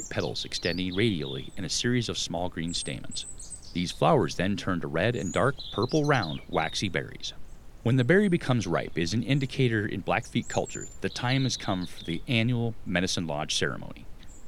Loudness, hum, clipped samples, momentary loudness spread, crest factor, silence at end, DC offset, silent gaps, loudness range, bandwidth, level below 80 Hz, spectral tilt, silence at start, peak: -28 LUFS; none; under 0.1%; 11 LU; 20 dB; 0 s; under 0.1%; none; 3 LU; 14.5 kHz; -48 dBFS; -5 dB/octave; 0 s; -8 dBFS